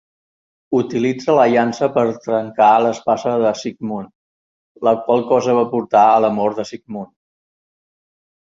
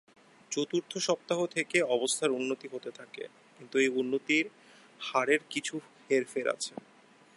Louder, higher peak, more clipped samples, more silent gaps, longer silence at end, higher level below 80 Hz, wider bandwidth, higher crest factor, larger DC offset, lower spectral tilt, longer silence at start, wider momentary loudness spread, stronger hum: first, -16 LUFS vs -31 LUFS; first, -2 dBFS vs -12 dBFS; neither; first, 4.15-4.75 s vs none; first, 1.4 s vs 0.6 s; first, -62 dBFS vs -84 dBFS; second, 7.8 kHz vs 11.5 kHz; about the same, 16 dB vs 20 dB; neither; first, -6 dB/octave vs -3 dB/octave; first, 0.7 s vs 0.5 s; about the same, 15 LU vs 15 LU; neither